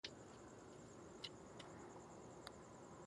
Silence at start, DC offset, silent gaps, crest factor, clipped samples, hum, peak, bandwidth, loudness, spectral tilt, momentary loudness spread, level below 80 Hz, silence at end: 0.05 s; under 0.1%; none; 24 dB; under 0.1%; none; -34 dBFS; 11.5 kHz; -57 LUFS; -4 dB/octave; 5 LU; -78 dBFS; 0 s